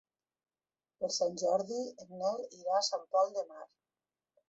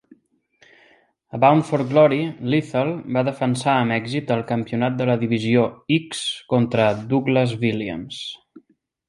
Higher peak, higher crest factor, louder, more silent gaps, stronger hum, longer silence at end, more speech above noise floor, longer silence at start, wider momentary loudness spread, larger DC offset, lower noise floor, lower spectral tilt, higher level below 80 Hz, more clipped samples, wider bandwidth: second, -18 dBFS vs -2 dBFS; about the same, 18 dB vs 18 dB; second, -34 LUFS vs -20 LUFS; neither; neither; first, 0.85 s vs 0.5 s; first, over 56 dB vs 40 dB; second, 1 s vs 1.35 s; about the same, 10 LU vs 10 LU; neither; first, under -90 dBFS vs -60 dBFS; second, -2.5 dB/octave vs -6.5 dB/octave; second, -84 dBFS vs -58 dBFS; neither; second, 8.2 kHz vs 11.5 kHz